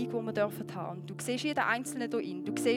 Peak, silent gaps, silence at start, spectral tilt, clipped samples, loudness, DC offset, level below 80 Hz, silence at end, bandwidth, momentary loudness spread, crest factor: -14 dBFS; none; 0 s; -4.5 dB/octave; under 0.1%; -34 LUFS; under 0.1%; -82 dBFS; 0 s; 18.5 kHz; 9 LU; 18 dB